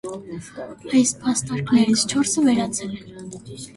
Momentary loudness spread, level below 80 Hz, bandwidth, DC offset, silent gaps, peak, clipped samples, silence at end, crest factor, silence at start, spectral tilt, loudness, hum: 18 LU; -56 dBFS; 11.5 kHz; under 0.1%; none; -6 dBFS; under 0.1%; 0.05 s; 16 dB; 0.05 s; -4 dB/octave; -20 LUFS; none